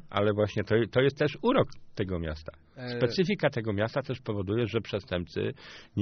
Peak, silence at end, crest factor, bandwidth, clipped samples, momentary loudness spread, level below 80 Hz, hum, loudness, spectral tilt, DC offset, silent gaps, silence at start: -10 dBFS; 0 s; 18 dB; 6.6 kHz; under 0.1%; 11 LU; -52 dBFS; none; -29 LUFS; -5.5 dB/octave; under 0.1%; none; 0.05 s